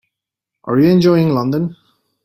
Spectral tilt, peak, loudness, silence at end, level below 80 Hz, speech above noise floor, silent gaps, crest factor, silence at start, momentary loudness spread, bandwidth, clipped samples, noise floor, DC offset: -8.5 dB/octave; -2 dBFS; -14 LUFS; 0.5 s; -54 dBFS; 69 dB; none; 14 dB; 0.65 s; 13 LU; 15.5 kHz; under 0.1%; -82 dBFS; under 0.1%